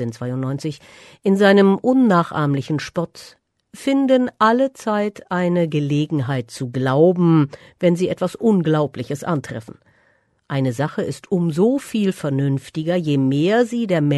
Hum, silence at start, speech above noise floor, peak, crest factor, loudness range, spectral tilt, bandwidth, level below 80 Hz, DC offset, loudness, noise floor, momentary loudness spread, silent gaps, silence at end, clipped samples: none; 0 s; 42 dB; -2 dBFS; 16 dB; 4 LU; -7 dB/octave; 12.5 kHz; -60 dBFS; under 0.1%; -19 LUFS; -61 dBFS; 11 LU; none; 0 s; under 0.1%